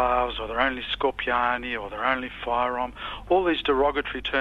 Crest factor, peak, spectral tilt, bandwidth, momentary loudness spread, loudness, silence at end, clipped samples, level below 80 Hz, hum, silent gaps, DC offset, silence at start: 18 dB; -6 dBFS; -6 dB/octave; 12 kHz; 6 LU; -25 LUFS; 0 s; under 0.1%; -44 dBFS; none; none; under 0.1%; 0 s